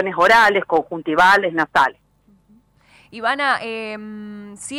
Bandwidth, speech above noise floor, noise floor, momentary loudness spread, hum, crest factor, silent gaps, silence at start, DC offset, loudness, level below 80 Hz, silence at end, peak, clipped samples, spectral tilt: 16.5 kHz; 38 dB; -56 dBFS; 20 LU; 50 Hz at -65 dBFS; 14 dB; none; 0 s; under 0.1%; -16 LUFS; -54 dBFS; 0 s; -6 dBFS; under 0.1%; -3.5 dB/octave